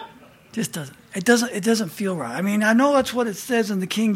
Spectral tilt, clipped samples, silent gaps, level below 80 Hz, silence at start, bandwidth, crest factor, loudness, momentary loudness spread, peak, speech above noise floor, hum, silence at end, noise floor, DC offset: -4.5 dB/octave; under 0.1%; none; -62 dBFS; 0 s; 16.5 kHz; 18 dB; -21 LUFS; 12 LU; -4 dBFS; 25 dB; none; 0 s; -46 dBFS; under 0.1%